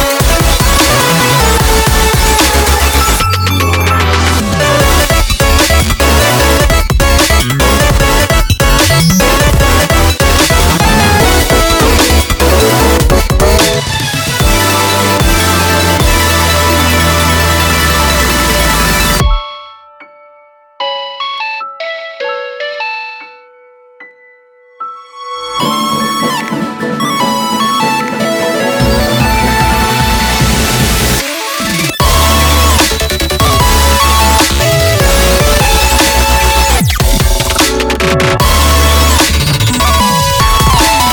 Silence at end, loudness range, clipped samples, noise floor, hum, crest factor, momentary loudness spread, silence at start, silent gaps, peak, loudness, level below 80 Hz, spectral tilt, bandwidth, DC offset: 0 s; 10 LU; under 0.1%; -43 dBFS; none; 10 dB; 9 LU; 0 s; none; 0 dBFS; -9 LUFS; -14 dBFS; -3.5 dB/octave; over 20 kHz; under 0.1%